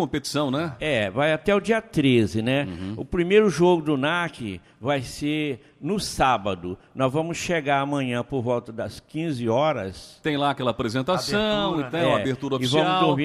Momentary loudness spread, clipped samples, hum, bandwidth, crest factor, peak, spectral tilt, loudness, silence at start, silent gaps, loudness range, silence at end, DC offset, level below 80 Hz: 11 LU; under 0.1%; none; 15 kHz; 18 dB; -6 dBFS; -5.5 dB/octave; -24 LUFS; 0 s; none; 4 LU; 0 s; under 0.1%; -50 dBFS